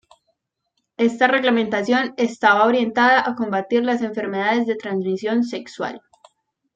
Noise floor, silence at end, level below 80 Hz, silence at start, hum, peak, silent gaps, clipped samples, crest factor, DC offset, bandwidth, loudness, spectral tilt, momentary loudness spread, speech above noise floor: -74 dBFS; 0.8 s; -68 dBFS; 1 s; none; -2 dBFS; none; under 0.1%; 18 dB; under 0.1%; 7.8 kHz; -19 LUFS; -5 dB/octave; 9 LU; 55 dB